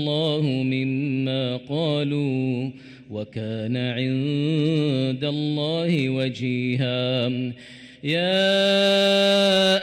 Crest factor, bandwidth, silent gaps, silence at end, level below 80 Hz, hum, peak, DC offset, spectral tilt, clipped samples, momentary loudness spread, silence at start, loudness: 12 dB; 15.5 kHz; none; 0 s; -66 dBFS; none; -12 dBFS; under 0.1%; -6 dB/octave; under 0.1%; 12 LU; 0 s; -22 LUFS